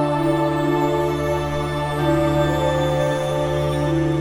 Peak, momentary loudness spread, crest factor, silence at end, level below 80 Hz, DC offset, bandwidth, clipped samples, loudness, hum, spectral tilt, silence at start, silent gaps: -6 dBFS; 3 LU; 12 dB; 0 s; -36 dBFS; 0.2%; 16 kHz; under 0.1%; -20 LUFS; none; -7 dB/octave; 0 s; none